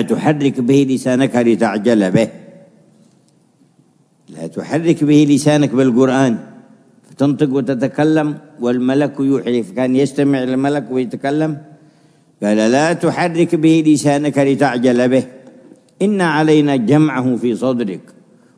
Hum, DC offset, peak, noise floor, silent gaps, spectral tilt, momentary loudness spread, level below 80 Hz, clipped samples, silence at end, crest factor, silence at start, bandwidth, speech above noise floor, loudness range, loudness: none; under 0.1%; 0 dBFS; -54 dBFS; none; -6.5 dB/octave; 9 LU; -64 dBFS; under 0.1%; 0.6 s; 16 dB; 0 s; 11 kHz; 40 dB; 4 LU; -15 LUFS